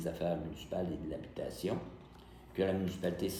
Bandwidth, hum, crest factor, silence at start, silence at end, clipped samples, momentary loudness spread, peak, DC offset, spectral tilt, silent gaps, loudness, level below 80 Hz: 17 kHz; none; 18 dB; 0 s; 0 s; under 0.1%; 17 LU; -20 dBFS; under 0.1%; -6.5 dB/octave; none; -38 LUFS; -58 dBFS